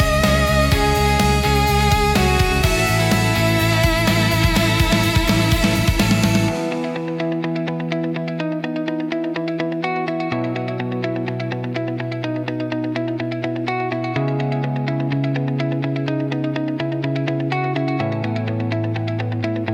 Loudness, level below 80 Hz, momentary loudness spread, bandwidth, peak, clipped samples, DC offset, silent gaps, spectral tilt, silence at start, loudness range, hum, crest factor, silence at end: -19 LUFS; -30 dBFS; 8 LU; 17.5 kHz; -4 dBFS; under 0.1%; under 0.1%; none; -5.5 dB/octave; 0 s; 7 LU; none; 16 dB; 0 s